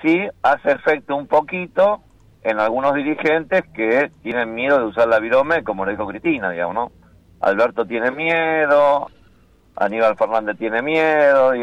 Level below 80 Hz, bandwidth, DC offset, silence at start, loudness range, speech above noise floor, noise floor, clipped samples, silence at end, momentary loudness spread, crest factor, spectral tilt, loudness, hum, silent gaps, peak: -56 dBFS; 7.8 kHz; under 0.1%; 0 s; 2 LU; 35 dB; -53 dBFS; under 0.1%; 0 s; 9 LU; 12 dB; -6.5 dB/octave; -18 LUFS; none; none; -6 dBFS